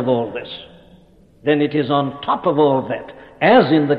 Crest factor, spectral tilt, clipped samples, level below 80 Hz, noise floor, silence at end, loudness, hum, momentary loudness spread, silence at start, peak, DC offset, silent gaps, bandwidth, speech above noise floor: 16 dB; -9 dB/octave; under 0.1%; -56 dBFS; -49 dBFS; 0 s; -17 LUFS; none; 17 LU; 0 s; -2 dBFS; under 0.1%; none; 5 kHz; 32 dB